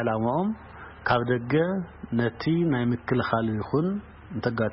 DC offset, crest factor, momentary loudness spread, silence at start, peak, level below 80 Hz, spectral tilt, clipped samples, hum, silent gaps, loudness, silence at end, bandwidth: under 0.1%; 18 dB; 9 LU; 0 s; -8 dBFS; -52 dBFS; -11.5 dB/octave; under 0.1%; none; none; -26 LUFS; 0 s; 5.8 kHz